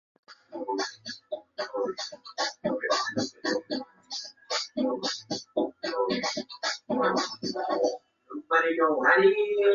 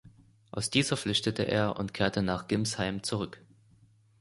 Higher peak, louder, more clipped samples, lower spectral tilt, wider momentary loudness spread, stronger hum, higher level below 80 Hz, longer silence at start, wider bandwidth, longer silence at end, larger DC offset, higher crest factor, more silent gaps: about the same, -8 dBFS vs -10 dBFS; about the same, -28 LUFS vs -30 LUFS; neither; second, -3 dB/octave vs -4.5 dB/octave; first, 14 LU vs 8 LU; neither; second, -72 dBFS vs -56 dBFS; first, 0.3 s vs 0.05 s; second, 7.6 kHz vs 11.5 kHz; second, 0 s vs 0.85 s; neither; about the same, 20 dB vs 22 dB; neither